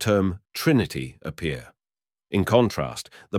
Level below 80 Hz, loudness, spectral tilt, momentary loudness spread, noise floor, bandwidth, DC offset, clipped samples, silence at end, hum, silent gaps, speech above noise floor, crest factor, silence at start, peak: -48 dBFS; -24 LUFS; -6 dB/octave; 13 LU; under -90 dBFS; 17 kHz; under 0.1%; under 0.1%; 0 s; none; none; over 66 dB; 20 dB; 0 s; -4 dBFS